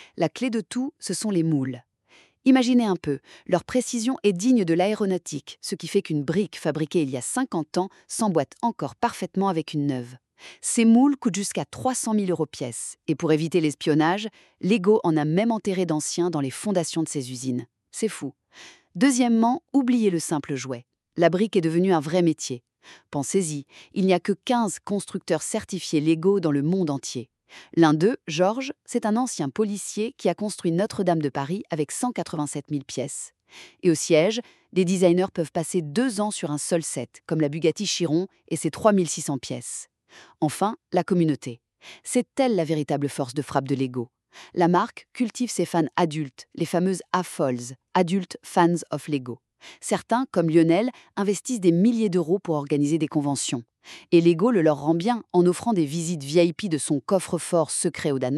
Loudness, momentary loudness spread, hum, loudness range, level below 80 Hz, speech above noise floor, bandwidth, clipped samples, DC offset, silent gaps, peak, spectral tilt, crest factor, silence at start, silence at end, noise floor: -24 LUFS; 11 LU; none; 4 LU; -70 dBFS; 35 dB; 13 kHz; under 0.1%; under 0.1%; none; -4 dBFS; -5.5 dB/octave; 20 dB; 0 s; 0 s; -58 dBFS